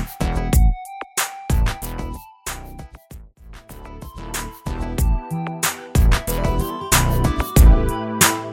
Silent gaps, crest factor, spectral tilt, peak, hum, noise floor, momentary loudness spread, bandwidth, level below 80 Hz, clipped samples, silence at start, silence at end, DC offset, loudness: none; 20 dB; -4 dB/octave; 0 dBFS; none; -41 dBFS; 20 LU; 18.5 kHz; -22 dBFS; under 0.1%; 0 s; 0 s; under 0.1%; -20 LUFS